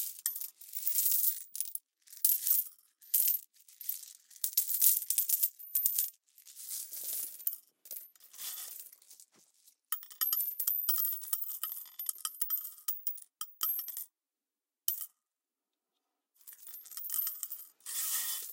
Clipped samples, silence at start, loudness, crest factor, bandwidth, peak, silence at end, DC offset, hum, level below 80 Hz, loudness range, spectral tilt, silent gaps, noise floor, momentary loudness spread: under 0.1%; 0 s; -32 LUFS; 32 dB; 17 kHz; -6 dBFS; 0 s; under 0.1%; none; under -90 dBFS; 11 LU; 5 dB/octave; none; under -90 dBFS; 17 LU